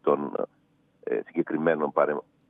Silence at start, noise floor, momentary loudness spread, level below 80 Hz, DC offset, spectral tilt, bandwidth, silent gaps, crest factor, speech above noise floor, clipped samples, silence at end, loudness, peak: 0.05 s; -61 dBFS; 10 LU; -82 dBFS; under 0.1%; -9.5 dB/octave; 3.8 kHz; none; 20 dB; 35 dB; under 0.1%; 0.3 s; -28 LUFS; -8 dBFS